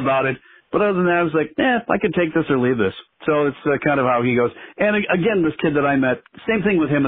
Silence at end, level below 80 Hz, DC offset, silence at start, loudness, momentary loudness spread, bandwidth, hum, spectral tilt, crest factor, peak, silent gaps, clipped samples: 0 s; -52 dBFS; under 0.1%; 0 s; -19 LUFS; 6 LU; 4 kHz; none; -5 dB/octave; 16 dB; -2 dBFS; none; under 0.1%